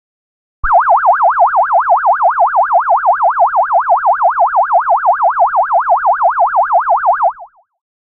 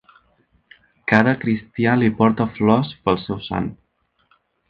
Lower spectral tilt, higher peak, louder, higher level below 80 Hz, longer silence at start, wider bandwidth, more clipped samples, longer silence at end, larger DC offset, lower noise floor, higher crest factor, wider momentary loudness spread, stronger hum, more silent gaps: about the same, -7.5 dB/octave vs -8.5 dB/octave; about the same, -2 dBFS vs 0 dBFS; first, -11 LUFS vs -19 LUFS; first, -38 dBFS vs -50 dBFS; second, 0.65 s vs 1.05 s; second, 3.1 kHz vs 6 kHz; neither; second, 0.6 s vs 0.95 s; neither; second, -36 dBFS vs -67 dBFS; second, 10 dB vs 20 dB; second, 2 LU vs 10 LU; neither; neither